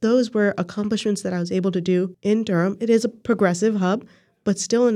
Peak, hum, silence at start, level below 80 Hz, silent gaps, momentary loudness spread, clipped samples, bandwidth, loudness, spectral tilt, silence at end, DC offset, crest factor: -6 dBFS; none; 0 s; -64 dBFS; none; 5 LU; under 0.1%; 12 kHz; -22 LUFS; -6 dB/octave; 0 s; under 0.1%; 14 dB